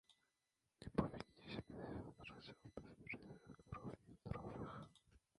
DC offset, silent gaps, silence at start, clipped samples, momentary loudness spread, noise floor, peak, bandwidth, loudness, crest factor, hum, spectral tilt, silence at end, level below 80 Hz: under 0.1%; none; 0.1 s; under 0.1%; 14 LU; -89 dBFS; -26 dBFS; 11 kHz; -52 LUFS; 28 dB; none; -7.5 dB/octave; 0.2 s; -66 dBFS